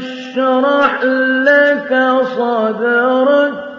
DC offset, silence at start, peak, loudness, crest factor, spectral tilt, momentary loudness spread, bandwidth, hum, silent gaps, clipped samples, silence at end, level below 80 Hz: under 0.1%; 0 s; 0 dBFS; -13 LUFS; 12 dB; -5.5 dB/octave; 5 LU; 7 kHz; none; none; under 0.1%; 0 s; -64 dBFS